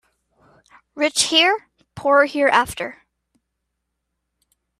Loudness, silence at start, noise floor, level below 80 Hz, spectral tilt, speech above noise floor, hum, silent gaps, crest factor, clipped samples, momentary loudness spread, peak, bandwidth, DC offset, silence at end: -18 LUFS; 0.95 s; -77 dBFS; -58 dBFS; -1.5 dB/octave; 60 dB; none; none; 22 dB; under 0.1%; 12 LU; 0 dBFS; 14.5 kHz; under 0.1%; 1.85 s